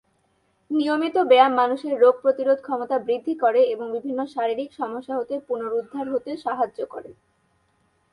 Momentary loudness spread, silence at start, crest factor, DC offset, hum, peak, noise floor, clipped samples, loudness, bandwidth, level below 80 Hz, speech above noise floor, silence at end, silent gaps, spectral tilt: 11 LU; 0.7 s; 20 dB; under 0.1%; none; -4 dBFS; -67 dBFS; under 0.1%; -22 LUFS; 10.5 kHz; -72 dBFS; 45 dB; 1 s; none; -5.5 dB/octave